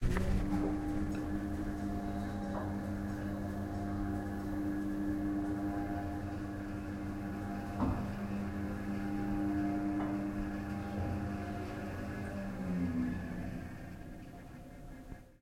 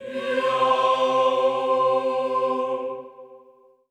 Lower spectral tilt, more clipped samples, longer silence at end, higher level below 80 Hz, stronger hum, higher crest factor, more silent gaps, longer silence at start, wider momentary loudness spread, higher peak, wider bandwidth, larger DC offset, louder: first, -8 dB/octave vs -4 dB/octave; neither; second, 0.05 s vs 0.55 s; first, -46 dBFS vs -74 dBFS; neither; about the same, 18 dB vs 16 dB; neither; about the same, 0 s vs 0 s; about the same, 10 LU vs 10 LU; second, -20 dBFS vs -8 dBFS; first, 16.5 kHz vs 9.8 kHz; neither; second, -38 LUFS vs -22 LUFS